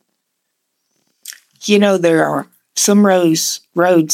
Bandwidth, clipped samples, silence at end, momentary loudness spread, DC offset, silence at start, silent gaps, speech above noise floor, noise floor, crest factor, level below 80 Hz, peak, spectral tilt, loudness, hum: 16.5 kHz; under 0.1%; 0 s; 23 LU; under 0.1%; 1.25 s; none; 59 dB; -72 dBFS; 14 dB; -78 dBFS; 0 dBFS; -4 dB/octave; -14 LUFS; none